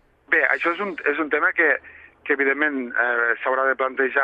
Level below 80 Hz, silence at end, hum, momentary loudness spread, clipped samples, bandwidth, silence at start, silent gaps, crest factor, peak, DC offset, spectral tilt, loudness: -68 dBFS; 0 s; none; 6 LU; under 0.1%; 7.4 kHz; 0.3 s; none; 18 dB; -4 dBFS; under 0.1%; -6 dB/octave; -21 LUFS